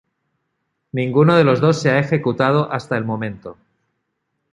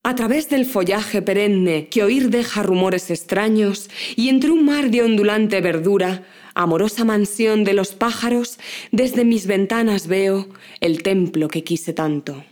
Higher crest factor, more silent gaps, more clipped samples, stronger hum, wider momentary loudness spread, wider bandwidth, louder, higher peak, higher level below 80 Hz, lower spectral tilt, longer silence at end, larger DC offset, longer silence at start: about the same, 16 dB vs 18 dB; neither; neither; neither; first, 13 LU vs 7 LU; second, 9.2 kHz vs over 20 kHz; about the same, -17 LUFS vs -18 LUFS; about the same, -2 dBFS vs 0 dBFS; about the same, -58 dBFS vs -60 dBFS; first, -7 dB/octave vs -5.5 dB/octave; first, 1 s vs 0.1 s; neither; first, 0.95 s vs 0.05 s